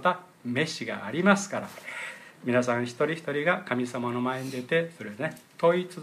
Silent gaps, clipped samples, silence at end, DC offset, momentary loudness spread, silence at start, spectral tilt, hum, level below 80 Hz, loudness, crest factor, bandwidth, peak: none; under 0.1%; 0 s; under 0.1%; 12 LU; 0 s; -5 dB/octave; none; -76 dBFS; -28 LUFS; 20 dB; 15 kHz; -8 dBFS